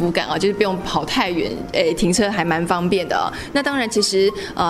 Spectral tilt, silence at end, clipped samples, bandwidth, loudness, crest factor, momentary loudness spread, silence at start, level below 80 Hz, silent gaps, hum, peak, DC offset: -4 dB/octave; 0 s; under 0.1%; 15 kHz; -19 LUFS; 18 dB; 4 LU; 0 s; -42 dBFS; none; none; -2 dBFS; under 0.1%